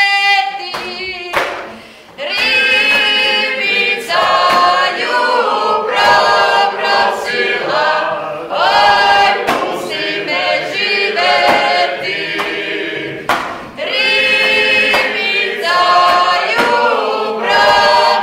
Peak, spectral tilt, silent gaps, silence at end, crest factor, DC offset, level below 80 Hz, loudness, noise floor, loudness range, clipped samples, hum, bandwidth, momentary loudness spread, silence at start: 0 dBFS; -2 dB/octave; none; 0 s; 12 dB; under 0.1%; -50 dBFS; -12 LUFS; -34 dBFS; 3 LU; under 0.1%; none; 16 kHz; 10 LU; 0 s